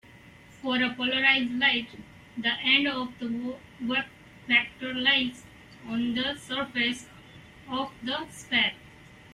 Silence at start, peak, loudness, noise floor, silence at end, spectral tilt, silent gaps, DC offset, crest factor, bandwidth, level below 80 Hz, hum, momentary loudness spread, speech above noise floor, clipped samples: 0.15 s; -8 dBFS; -26 LUFS; -52 dBFS; 0 s; -3.5 dB/octave; none; under 0.1%; 20 dB; 13 kHz; -62 dBFS; none; 15 LU; 24 dB; under 0.1%